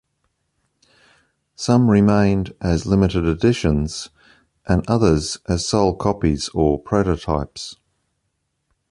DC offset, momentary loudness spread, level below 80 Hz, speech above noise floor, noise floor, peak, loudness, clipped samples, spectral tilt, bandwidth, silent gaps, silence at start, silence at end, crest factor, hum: under 0.1%; 13 LU; -34 dBFS; 55 dB; -73 dBFS; -2 dBFS; -19 LUFS; under 0.1%; -6.5 dB/octave; 11.5 kHz; none; 1.6 s; 1.15 s; 18 dB; none